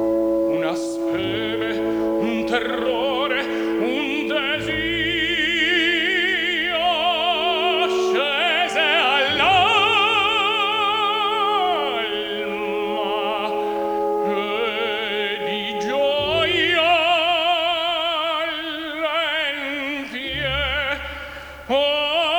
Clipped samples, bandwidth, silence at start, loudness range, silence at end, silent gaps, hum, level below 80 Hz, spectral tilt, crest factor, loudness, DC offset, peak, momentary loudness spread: under 0.1%; over 20 kHz; 0 s; 6 LU; 0 s; none; none; -48 dBFS; -3.5 dB/octave; 16 dB; -20 LUFS; under 0.1%; -4 dBFS; 8 LU